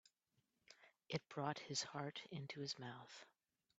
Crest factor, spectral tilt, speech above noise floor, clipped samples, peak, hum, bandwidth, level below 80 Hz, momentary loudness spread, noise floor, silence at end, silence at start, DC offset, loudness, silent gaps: 24 dB; -3.5 dB/octave; 38 dB; under 0.1%; -28 dBFS; none; 8 kHz; -86 dBFS; 22 LU; -86 dBFS; 0.5 s; 0.7 s; under 0.1%; -48 LUFS; none